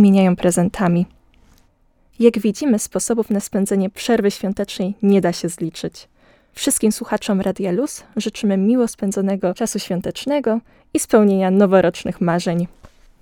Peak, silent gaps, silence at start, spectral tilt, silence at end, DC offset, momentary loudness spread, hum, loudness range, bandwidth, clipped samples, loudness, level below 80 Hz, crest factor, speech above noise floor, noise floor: 0 dBFS; none; 0 s; -5.5 dB/octave; 0.35 s; under 0.1%; 10 LU; none; 3 LU; 17.5 kHz; under 0.1%; -18 LUFS; -50 dBFS; 18 dB; 39 dB; -57 dBFS